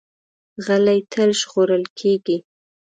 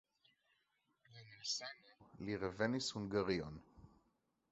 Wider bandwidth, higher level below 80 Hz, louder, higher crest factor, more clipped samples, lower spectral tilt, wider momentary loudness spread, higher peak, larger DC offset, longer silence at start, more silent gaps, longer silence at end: first, 9.4 kHz vs 8 kHz; about the same, -68 dBFS vs -68 dBFS; first, -19 LUFS vs -42 LUFS; second, 14 dB vs 22 dB; neither; about the same, -4.5 dB/octave vs -4 dB/octave; second, 8 LU vs 20 LU; first, -6 dBFS vs -22 dBFS; neither; second, 0.6 s vs 1.1 s; first, 1.90-1.96 s vs none; second, 0.5 s vs 0.65 s